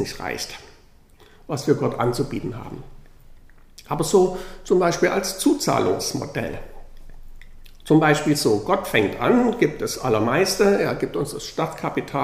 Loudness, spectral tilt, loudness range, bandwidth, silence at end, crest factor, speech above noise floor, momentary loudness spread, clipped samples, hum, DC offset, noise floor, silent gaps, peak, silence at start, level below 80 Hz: -21 LUFS; -5 dB/octave; 7 LU; 15.5 kHz; 0 s; 20 dB; 29 dB; 13 LU; under 0.1%; none; under 0.1%; -50 dBFS; none; -2 dBFS; 0 s; -44 dBFS